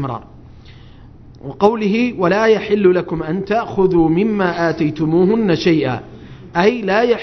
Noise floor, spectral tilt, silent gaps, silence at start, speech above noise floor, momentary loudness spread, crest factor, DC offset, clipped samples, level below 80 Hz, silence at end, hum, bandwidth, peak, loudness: -39 dBFS; -7.5 dB/octave; none; 0 s; 24 dB; 10 LU; 16 dB; under 0.1%; under 0.1%; -44 dBFS; 0 s; none; 6.4 kHz; 0 dBFS; -16 LUFS